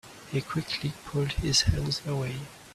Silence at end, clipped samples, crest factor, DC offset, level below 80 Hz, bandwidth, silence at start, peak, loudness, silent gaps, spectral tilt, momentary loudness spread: 0 s; under 0.1%; 18 dB; under 0.1%; -42 dBFS; 14 kHz; 0.05 s; -12 dBFS; -29 LUFS; none; -4 dB/octave; 10 LU